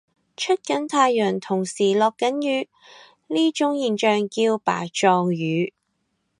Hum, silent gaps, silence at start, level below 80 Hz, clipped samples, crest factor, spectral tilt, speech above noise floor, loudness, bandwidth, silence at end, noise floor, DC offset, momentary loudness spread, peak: none; none; 0.4 s; -74 dBFS; under 0.1%; 18 dB; -4.5 dB/octave; 52 dB; -22 LUFS; 11 kHz; 0.7 s; -73 dBFS; under 0.1%; 7 LU; -4 dBFS